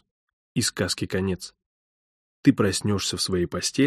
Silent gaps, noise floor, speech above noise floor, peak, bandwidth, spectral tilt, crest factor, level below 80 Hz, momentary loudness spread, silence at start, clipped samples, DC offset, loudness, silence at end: 1.66-2.43 s; under -90 dBFS; over 66 dB; -4 dBFS; 14 kHz; -4.5 dB/octave; 20 dB; -54 dBFS; 9 LU; 0.55 s; under 0.1%; under 0.1%; -25 LUFS; 0 s